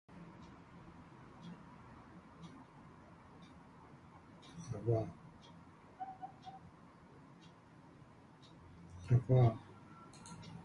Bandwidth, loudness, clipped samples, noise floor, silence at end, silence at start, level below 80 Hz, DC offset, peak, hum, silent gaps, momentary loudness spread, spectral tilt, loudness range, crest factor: 10 kHz; -37 LUFS; under 0.1%; -60 dBFS; 0.05 s; 0.1 s; -64 dBFS; under 0.1%; -20 dBFS; none; none; 25 LU; -8.5 dB/octave; 18 LU; 22 dB